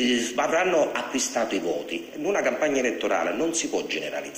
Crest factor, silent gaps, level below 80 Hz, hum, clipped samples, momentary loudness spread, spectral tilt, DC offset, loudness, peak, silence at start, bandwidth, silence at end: 16 dB; none; -62 dBFS; none; under 0.1%; 6 LU; -2 dB/octave; under 0.1%; -25 LUFS; -10 dBFS; 0 s; 16 kHz; 0 s